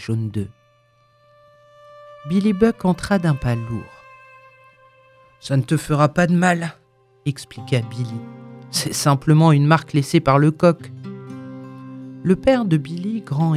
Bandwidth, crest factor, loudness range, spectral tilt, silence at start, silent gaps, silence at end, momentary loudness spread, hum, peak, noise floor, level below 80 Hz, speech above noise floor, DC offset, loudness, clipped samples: 14.5 kHz; 20 dB; 5 LU; -6.5 dB/octave; 0 s; none; 0 s; 20 LU; none; 0 dBFS; -58 dBFS; -48 dBFS; 40 dB; under 0.1%; -19 LUFS; under 0.1%